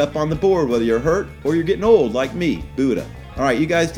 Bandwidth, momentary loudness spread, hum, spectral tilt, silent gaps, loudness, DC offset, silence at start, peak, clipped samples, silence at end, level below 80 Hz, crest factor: 15.5 kHz; 7 LU; none; -6 dB/octave; none; -19 LUFS; under 0.1%; 0 s; -2 dBFS; under 0.1%; 0 s; -38 dBFS; 16 dB